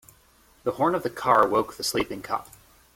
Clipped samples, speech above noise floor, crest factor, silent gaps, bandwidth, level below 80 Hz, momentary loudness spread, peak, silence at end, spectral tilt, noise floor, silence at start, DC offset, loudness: under 0.1%; 34 dB; 22 dB; none; 16.5 kHz; -56 dBFS; 12 LU; -6 dBFS; 0.55 s; -4 dB/octave; -58 dBFS; 0.65 s; under 0.1%; -25 LUFS